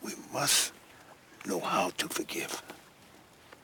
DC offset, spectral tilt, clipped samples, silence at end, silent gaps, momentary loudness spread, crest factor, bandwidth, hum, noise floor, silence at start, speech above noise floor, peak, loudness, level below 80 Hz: under 0.1%; -1.5 dB/octave; under 0.1%; 0.1 s; none; 18 LU; 22 dB; over 20 kHz; none; -57 dBFS; 0 s; 25 dB; -12 dBFS; -31 LUFS; -72 dBFS